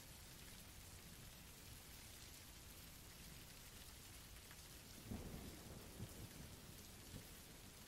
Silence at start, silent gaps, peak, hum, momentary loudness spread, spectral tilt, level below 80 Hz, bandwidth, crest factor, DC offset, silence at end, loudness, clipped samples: 0 s; none; -38 dBFS; none; 4 LU; -3.5 dB/octave; -64 dBFS; 16 kHz; 18 dB; under 0.1%; 0 s; -57 LUFS; under 0.1%